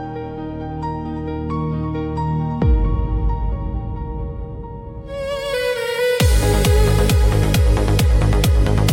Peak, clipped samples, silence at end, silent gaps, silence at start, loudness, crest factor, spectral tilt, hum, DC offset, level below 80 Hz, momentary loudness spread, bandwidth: -4 dBFS; under 0.1%; 0 s; none; 0 s; -19 LUFS; 14 dB; -6 dB/octave; none; under 0.1%; -20 dBFS; 13 LU; 17 kHz